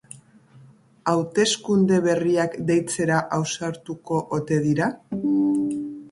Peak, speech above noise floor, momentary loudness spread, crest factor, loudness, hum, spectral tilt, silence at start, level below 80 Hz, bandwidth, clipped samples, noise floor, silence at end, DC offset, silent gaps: -6 dBFS; 29 dB; 8 LU; 18 dB; -23 LUFS; none; -5 dB/octave; 0.15 s; -62 dBFS; 11.5 kHz; under 0.1%; -51 dBFS; 0.05 s; under 0.1%; none